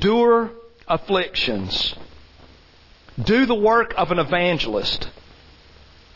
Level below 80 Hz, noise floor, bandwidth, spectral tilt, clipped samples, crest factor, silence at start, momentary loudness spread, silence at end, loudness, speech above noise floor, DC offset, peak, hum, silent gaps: -42 dBFS; -50 dBFS; 6 kHz; -6 dB/octave; under 0.1%; 14 dB; 0 s; 11 LU; 0.95 s; -20 LUFS; 31 dB; under 0.1%; -6 dBFS; none; none